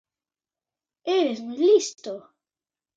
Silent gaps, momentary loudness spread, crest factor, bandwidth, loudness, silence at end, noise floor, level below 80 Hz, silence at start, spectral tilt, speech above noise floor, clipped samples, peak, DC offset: none; 17 LU; 18 dB; 9 kHz; -22 LUFS; 0.75 s; under -90 dBFS; -82 dBFS; 1.05 s; -3 dB/octave; over 68 dB; under 0.1%; -8 dBFS; under 0.1%